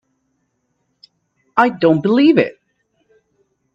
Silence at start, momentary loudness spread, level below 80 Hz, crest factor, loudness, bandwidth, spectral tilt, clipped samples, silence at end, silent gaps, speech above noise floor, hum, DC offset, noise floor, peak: 1.55 s; 8 LU; -64 dBFS; 18 dB; -14 LUFS; 6.8 kHz; -8 dB/octave; under 0.1%; 1.25 s; none; 56 dB; none; under 0.1%; -68 dBFS; 0 dBFS